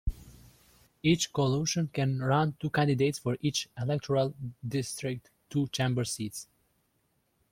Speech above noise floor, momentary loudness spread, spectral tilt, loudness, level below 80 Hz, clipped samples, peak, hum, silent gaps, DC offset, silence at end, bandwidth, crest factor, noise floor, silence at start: 44 dB; 9 LU; -5 dB/octave; -30 LUFS; -48 dBFS; under 0.1%; -12 dBFS; none; none; under 0.1%; 1.1 s; 16 kHz; 18 dB; -74 dBFS; 0.05 s